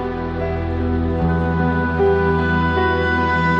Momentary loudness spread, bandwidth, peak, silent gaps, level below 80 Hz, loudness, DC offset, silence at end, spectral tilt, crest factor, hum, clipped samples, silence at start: 6 LU; 6.8 kHz; -8 dBFS; none; -30 dBFS; -18 LUFS; under 0.1%; 0 s; -8.5 dB/octave; 10 dB; none; under 0.1%; 0 s